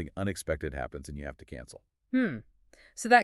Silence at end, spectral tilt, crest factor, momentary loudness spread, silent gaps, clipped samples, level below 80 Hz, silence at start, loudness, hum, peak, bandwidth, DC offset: 0 s; -5 dB/octave; 24 dB; 17 LU; none; under 0.1%; -48 dBFS; 0 s; -33 LUFS; none; -8 dBFS; 13.5 kHz; under 0.1%